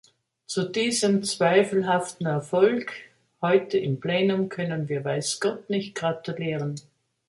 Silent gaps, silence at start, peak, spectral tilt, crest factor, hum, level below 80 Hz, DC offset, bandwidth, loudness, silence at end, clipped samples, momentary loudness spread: none; 0.5 s; -6 dBFS; -5 dB/octave; 18 dB; none; -70 dBFS; under 0.1%; 11.5 kHz; -25 LUFS; 0.5 s; under 0.1%; 9 LU